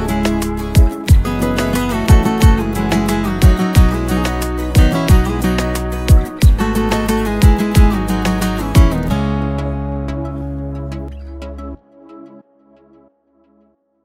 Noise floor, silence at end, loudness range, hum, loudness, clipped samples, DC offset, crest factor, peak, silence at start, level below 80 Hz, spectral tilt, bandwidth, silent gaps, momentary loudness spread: -56 dBFS; 1.8 s; 13 LU; none; -15 LUFS; under 0.1%; under 0.1%; 14 dB; 0 dBFS; 0 s; -18 dBFS; -6.5 dB/octave; 16.5 kHz; none; 12 LU